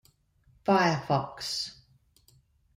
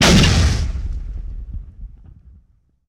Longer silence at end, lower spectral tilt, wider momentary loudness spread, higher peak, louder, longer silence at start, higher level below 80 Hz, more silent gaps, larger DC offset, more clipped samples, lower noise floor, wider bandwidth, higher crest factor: about the same, 1.05 s vs 0.95 s; about the same, -5 dB/octave vs -4.5 dB/octave; second, 10 LU vs 23 LU; second, -10 dBFS vs -4 dBFS; second, -28 LUFS vs -17 LUFS; first, 0.65 s vs 0 s; second, -64 dBFS vs -24 dBFS; neither; neither; neither; first, -65 dBFS vs -56 dBFS; about the same, 16 kHz vs 16.5 kHz; first, 22 dB vs 14 dB